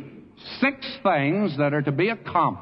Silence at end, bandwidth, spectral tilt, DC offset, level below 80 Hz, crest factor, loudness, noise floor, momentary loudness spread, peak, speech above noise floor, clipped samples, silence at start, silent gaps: 0 s; 5.8 kHz; -9.5 dB/octave; under 0.1%; -64 dBFS; 16 dB; -23 LUFS; -43 dBFS; 14 LU; -8 dBFS; 20 dB; under 0.1%; 0 s; none